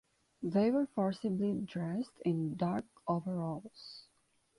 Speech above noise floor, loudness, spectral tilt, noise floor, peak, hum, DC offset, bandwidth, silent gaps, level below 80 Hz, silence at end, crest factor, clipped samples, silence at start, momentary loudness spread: 39 dB; -35 LUFS; -8.5 dB/octave; -74 dBFS; -20 dBFS; none; under 0.1%; 11.5 kHz; none; -72 dBFS; 0.6 s; 16 dB; under 0.1%; 0.4 s; 14 LU